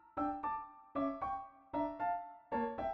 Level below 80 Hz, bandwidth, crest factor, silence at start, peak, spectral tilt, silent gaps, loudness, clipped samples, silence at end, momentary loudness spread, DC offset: -64 dBFS; 5.8 kHz; 14 dB; 0.05 s; -26 dBFS; -8.5 dB/octave; none; -40 LUFS; under 0.1%; 0 s; 6 LU; under 0.1%